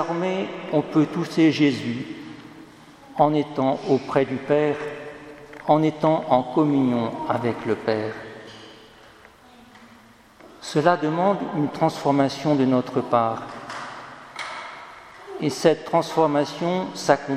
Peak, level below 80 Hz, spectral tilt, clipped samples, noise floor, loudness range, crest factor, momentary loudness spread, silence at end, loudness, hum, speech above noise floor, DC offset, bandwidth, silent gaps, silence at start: 0 dBFS; -64 dBFS; -6.5 dB/octave; under 0.1%; -50 dBFS; 5 LU; 22 dB; 18 LU; 0 s; -22 LUFS; none; 29 dB; under 0.1%; 14 kHz; none; 0 s